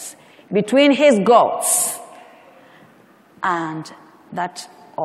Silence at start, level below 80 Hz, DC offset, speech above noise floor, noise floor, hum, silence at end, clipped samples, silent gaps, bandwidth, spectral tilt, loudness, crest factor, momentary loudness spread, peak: 0 s; -74 dBFS; under 0.1%; 34 dB; -50 dBFS; none; 0 s; under 0.1%; none; 15.5 kHz; -3.5 dB/octave; -17 LUFS; 18 dB; 21 LU; 0 dBFS